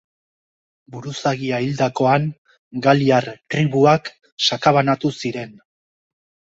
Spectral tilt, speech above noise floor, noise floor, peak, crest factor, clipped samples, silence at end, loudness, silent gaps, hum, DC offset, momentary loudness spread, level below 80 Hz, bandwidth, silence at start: -5.5 dB/octave; over 72 dB; under -90 dBFS; -2 dBFS; 18 dB; under 0.1%; 1.05 s; -18 LUFS; 2.38-2.45 s, 2.59-2.71 s, 4.32-4.37 s; none; under 0.1%; 16 LU; -58 dBFS; 8 kHz; 0.9 s